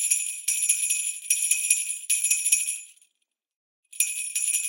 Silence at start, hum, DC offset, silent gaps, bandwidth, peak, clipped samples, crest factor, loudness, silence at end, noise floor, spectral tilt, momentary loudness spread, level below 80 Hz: 0 s; none; under 0.1%; 3.56-3.83 s; 17 kHz; -4 dBFS; under 0.1%; 24 dB; -23 LUFS; 0 s; -78 dBFS; 8 dB/octave; 5 LU; under -90 dBFS